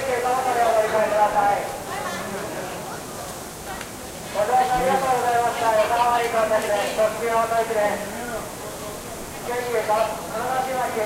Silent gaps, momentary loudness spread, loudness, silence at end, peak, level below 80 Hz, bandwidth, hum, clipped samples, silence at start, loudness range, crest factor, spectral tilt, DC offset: none; 13 LU; -23 LUFS; 0 s; -8 dBFS; -50 dBFS; 16 kHz; none; under 0.1%; 0 s; 5 LU; 16 dB; -3.5 dB/octave; under 0.1%